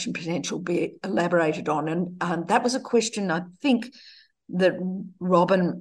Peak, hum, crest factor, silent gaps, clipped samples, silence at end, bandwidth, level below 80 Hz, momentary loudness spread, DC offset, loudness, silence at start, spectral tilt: -6 dBFS; none; 18 dB; none; under 0.1%; 0 s; 11.5 kHz; -70 dBFS; 7 LU; under 0.1%; -25 LUFS; 0 s; -5.5 dB/octave